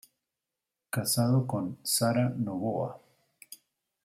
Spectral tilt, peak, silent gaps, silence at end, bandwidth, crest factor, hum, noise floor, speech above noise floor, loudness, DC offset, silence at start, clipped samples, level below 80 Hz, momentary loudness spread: -5 dB/octave; -12 dBFS; none; 0.5 s; 16 kHz; 18 dB; none; -88 dBFS; 59 dB; -29 LUFS; under 0.1%; 0.95 s; under 0.1%; -72 dBFS; 23 LU